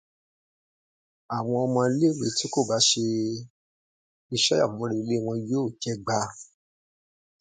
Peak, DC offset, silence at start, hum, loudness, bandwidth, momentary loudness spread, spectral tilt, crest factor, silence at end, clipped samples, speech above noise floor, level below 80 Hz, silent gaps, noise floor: -8 dBFS; under 0.1%; 1.3 s; none; -25 LUFS; 9.6 kHz; 11 LU; -4 dB/octave; 20 dB; 1 s; under 0.1%; over 65 dB; -66 dBFS; 3.50-4.29 s; under -90 dBFS